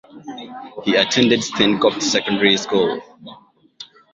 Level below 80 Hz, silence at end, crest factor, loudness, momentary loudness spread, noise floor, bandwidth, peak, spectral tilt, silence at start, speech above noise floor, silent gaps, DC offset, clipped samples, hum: -58 dBFS; 0.3 s; 18 dB; -17 LUFS; 19 LU; -43 dBFS; 8 kHz; -2 dBFS; -3.5 dB/octave; 0.15 s; 25 dB; none; under 0.1%; under 0.1%; none